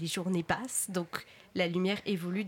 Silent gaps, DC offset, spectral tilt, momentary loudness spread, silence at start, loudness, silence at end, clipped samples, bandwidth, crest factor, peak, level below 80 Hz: none; under 0.1%; -4 dB/octave; 10 LU; 0 s; -33 LUFS; 0 s; under 0.1%; 16.5 kHz; 18 dB; -14 dBFS; -68 dBFS